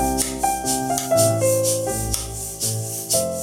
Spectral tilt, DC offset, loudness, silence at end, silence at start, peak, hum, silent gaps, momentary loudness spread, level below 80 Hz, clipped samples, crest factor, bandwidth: -3.5 dB/octave; under 0.1%; -21 LUFS; 0 s; 0 s; -2 dBFS; none; none; 7 LU; -38 dBFS; under 0.1%; 20 dB; 18.5 kHz